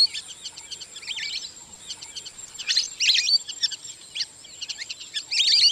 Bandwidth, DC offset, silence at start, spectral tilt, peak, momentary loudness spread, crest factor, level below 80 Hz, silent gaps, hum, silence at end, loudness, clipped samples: 15.5 kHz; under 0.1%; 0 s; 3 dB/octave; -8 dBFS; 18 LU; 18 dB; -68 dBFS; none; none; 0 s; -23 LUFS; under 0.1%